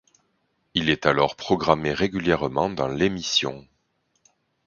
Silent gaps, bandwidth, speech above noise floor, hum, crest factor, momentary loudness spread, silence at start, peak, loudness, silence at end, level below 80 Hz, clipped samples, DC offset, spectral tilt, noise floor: none; 7.4 kHz; 48 dB; none; 24 dB; 4 LU; 0.75 s; 0 dBFS; -23 LUFS; 1.05 s; -50 dBFS; under 0.1%; under 0.1%; -4.5 dB/octave; -71 dBFS